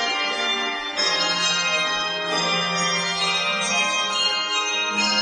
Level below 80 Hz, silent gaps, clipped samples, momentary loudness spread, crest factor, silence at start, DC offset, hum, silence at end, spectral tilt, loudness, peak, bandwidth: -62 dBFS; none; under 0.1%; 3 LU; 14 dB; 0 s; under 0.1%; none; 0 s; -1 dB/octave; -20 LUFS; -8 dBFS; 12 kHz